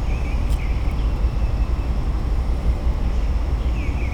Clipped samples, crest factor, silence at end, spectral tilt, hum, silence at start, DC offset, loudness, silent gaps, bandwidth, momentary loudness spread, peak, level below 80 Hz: under 0.1%; 12 dB; 0 s; -7.5 dB/octave; none; 0 s; under 0.1%; -24 LUFS; none; 8.8 kHz; 1 LU; -8 dBFS; -20 dBFS